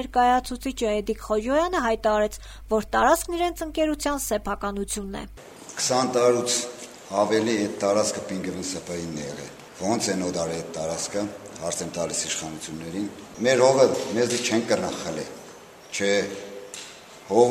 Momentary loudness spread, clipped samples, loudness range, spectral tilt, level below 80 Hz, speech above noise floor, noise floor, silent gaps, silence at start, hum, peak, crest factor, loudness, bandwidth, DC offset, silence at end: 16 LU; under 0.1%; 5 LU; -3.5 dB/octave; -46 dBFS; 21 dB; -45 dBFS; none; 0 s; none; -4 dBFS; 20 dB; -25 LUFS; 16.5 kHz; under 0.1%; 0 s